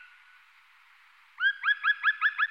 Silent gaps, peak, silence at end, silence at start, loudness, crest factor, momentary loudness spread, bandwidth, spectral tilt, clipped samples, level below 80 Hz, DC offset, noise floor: none; -16 dBFS; 0.05 s; 1.4 s; -26 LUFS; 16 dB; 4 LU; 7 kHz; 4 dB/octave; under 0.1%; -90 dBFS; under 0.1%; -59 dBFS